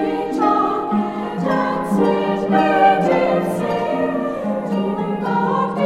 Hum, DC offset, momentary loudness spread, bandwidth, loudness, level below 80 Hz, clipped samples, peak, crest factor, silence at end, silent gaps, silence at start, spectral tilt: none; under 0.1%; 8 LU; 14 kHz; -18 LUFS; -52 dBFS; under 0.1%; -2 dBFS; 16 dB; 0 s; none; 0 s; -7 dB/octave